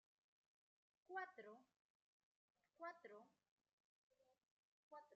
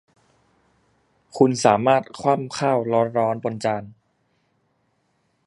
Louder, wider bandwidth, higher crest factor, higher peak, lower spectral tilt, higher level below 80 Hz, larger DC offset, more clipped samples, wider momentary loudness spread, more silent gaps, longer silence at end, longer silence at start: second, -58 LUFS vs -21 LUFS; second, 6.6 kHz vs 11.5 kHz; about the same, 24 dB vs 22 dB; second, -40 dBFS vs 0 dBFS; second, -1.5 dB/octave vs -5.5 dB/octave; second, under -90 dBFS vs -66 dBFS; neither; neither; first, 12 LU vs 9 LU; first, 1.76-2.55 s, 3.51-3.57 s, 3.73-4.10 s, 4.51-4.91 s vs none; second, 0 s vs 1.55 s; second, 1.1 s vs 1.35 s